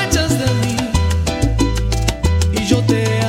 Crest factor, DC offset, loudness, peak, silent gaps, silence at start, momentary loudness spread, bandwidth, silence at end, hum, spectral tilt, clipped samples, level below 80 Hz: 14 dB; under 0.1%; -17 LUFS; 0 dBFS; none; 0 s; 3 LU; 16 kHz; 0 s; none; -5 dB/octave; under 0.1%; -24 dBFS